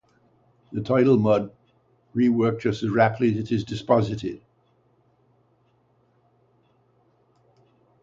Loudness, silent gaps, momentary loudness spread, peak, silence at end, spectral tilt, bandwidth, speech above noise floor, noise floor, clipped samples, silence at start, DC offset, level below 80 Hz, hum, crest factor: -23 LUFS; none; 15 LU; -4 dBFS; 3.65 s; -8 dB/octave; 7.6 kHz; 43 dB; -64 dBFS; under 0.1%; 0.7 s; under 0.1%; -58 dBFS; 60 Hz at -45 dBFS; 22 dB